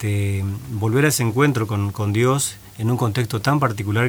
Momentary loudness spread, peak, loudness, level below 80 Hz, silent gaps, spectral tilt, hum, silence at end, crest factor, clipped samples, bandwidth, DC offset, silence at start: 7 LU; -2 dBFS; -20 LUFS; -52 dBFS; none; -5.5 dB/octave; none; 0 s; 16 dB; under 0.1%; over 20 kHz; under 0.1%; 0 s